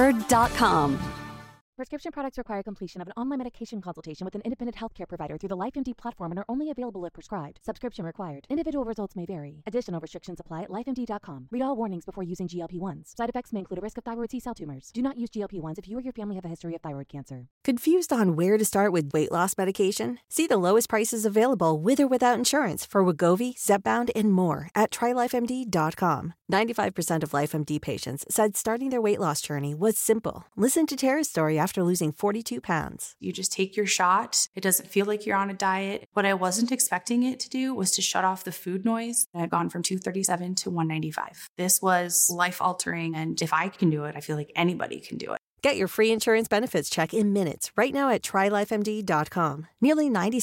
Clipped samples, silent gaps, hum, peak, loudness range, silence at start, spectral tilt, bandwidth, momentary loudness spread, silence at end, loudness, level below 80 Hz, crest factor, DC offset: under 0.1%; 1.61-1.73 s, 17.51-17.61 s, 34.48-34.53 s, 36.06-36.12 s, 39.26-39.33 s, 41.49-41.56 s, 45.39-45.57 s; none; -10 dBFS; 10 LU; 0 s; -4 dB/octave; 17 kHz; 14 LU; 0 s; -26 LUFS; -56 dBFS; 18 dB; under 0.1%